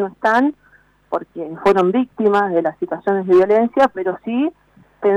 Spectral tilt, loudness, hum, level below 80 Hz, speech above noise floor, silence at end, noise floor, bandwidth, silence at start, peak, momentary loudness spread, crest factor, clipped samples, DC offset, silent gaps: -7 dB/octave; -17 LUFS; none; -56 dBFS; 37 dB; 0 s; -53 dBFS; 9.2 kHz; 0 s; -6 dBFS; 10 LU; 10 dB; under 0.1%; under 0.1%; none